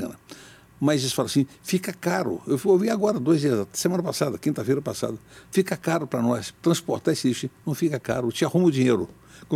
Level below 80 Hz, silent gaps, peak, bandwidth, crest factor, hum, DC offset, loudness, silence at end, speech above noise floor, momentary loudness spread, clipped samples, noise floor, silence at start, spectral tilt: -62 dBFS; none; -8 dBFS; 16.5 kHz; 16 dB; none; under 0.1%; -24 LUFS; 0 s; 23 dB; 9 LU; under 0.1%; -47 dBFS; 0 s; -5.5 dB/octave